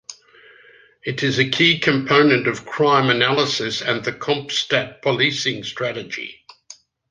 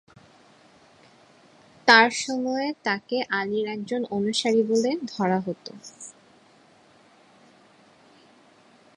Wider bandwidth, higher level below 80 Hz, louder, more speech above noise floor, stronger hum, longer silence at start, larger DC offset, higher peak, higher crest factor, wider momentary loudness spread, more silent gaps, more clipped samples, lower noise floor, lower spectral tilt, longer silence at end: second, 9.8 kHz vs 11.5 kHz; first, -60 dBFS vs -72 dBFS; first, -18 LUFS vs -23 LUFS; about the same, 31 dB vs 33 dB; neither; second, 0.1 s vs 1.85 s; neither; about the same, 0 dBFS vs -2 dBFS; second, 20 dB vs 26 dB; second, 13 LU vs 23 LU; neither; neither; second, -50 dBFS vs -56 dBFS; about the same, -4 dB/octave vs -3.5 dB/octave; second, 0.35 s vs 2.85 s